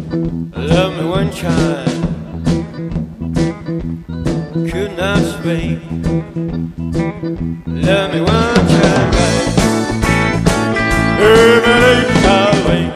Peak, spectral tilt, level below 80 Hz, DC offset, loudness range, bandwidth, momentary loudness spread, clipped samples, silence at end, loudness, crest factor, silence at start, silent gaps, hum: 0 dBFS; -5.5 dB/octave; -28 dBFS; under 0.1%; 8 LU; 14 kHz; 12 LU; under 0.1%; 0 s; -14 LUFS; 14 dB; 0 s; none; none